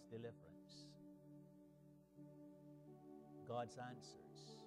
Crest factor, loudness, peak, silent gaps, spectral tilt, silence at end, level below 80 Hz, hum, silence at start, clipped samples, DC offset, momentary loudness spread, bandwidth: 22 dB; -57 LUFS; -36 dBFS; none; -5.5 dB/octave; 0 s; -86 dBFS; 60 Hz at -80 dBFS; 0 s; under 0.1%; under 0.1%; 16 LU; 13 kHz